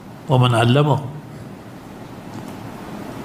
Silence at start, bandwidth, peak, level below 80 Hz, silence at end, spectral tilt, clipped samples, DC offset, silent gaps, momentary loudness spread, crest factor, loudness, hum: 0 s; 15 kHz; 0 dBFS; -52 dBFS; 0 s; -7 dB/octave; under 0.1%; under 0.1%; none; 21 LU; 20 dB; -17 LUFS; none